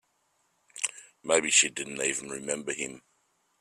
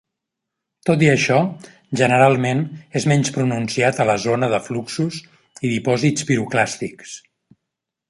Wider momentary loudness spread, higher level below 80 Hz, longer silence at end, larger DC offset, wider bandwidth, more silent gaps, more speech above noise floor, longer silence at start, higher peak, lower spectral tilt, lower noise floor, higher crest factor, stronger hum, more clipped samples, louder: about the same, 15 LU vs 14 LU; second, -74 dBFS vs -58 dBFS; second, 0.6 s vs 0.9 s; neither; first, 14.5 kHz vs 11.5 kHz; neither; second, 44 dB vs 63 dB; about the same, 0.75 s vs 0.85 s; second, -8 dBFS vs -2 dBFS; second, -0.5 dB/octave vs -5.5 dB/octave; second, -73 dBFS vs -81 dBFS; first, 24 dB vs 18 dB; neither; neither; second, -27 LUFS vs -19 LUFS